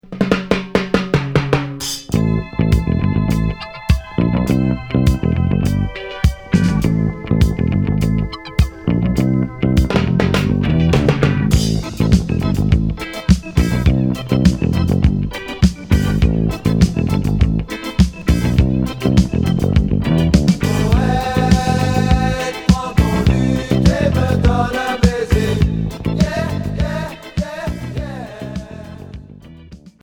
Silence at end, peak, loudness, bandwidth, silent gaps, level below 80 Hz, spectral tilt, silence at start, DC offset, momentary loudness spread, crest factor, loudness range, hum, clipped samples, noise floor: 0.15 s; 0 dBFS; -17 LUFS; 19 kHz; none; -24 dBFS; -7 dB/octave; 0.1 s; under 0.1%; 8 LU; 16 dB; 3 LU; none; under 0.1%; -39 dBFS